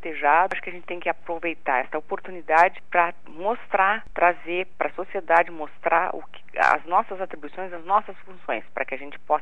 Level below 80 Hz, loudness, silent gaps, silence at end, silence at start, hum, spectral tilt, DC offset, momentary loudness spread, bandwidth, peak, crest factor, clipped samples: -60 dBFS; -24 LUFS; none; 0 s; 0 s; none; -5 dB/octave; 2%; 14 LU; 9.8 kHz; -2 dBFS; 22 dB; under 0.1%